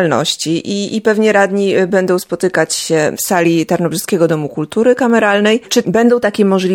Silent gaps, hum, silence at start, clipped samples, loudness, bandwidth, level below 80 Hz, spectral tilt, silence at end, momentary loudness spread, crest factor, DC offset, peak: none; none; 0 s; under 0.1%; -13 LUFS; 17.5 kHz; -56 dBFS; -4.5 dB/octave; 0 s; 5 LU; 12 dB; under 0.1%; 0 dBFS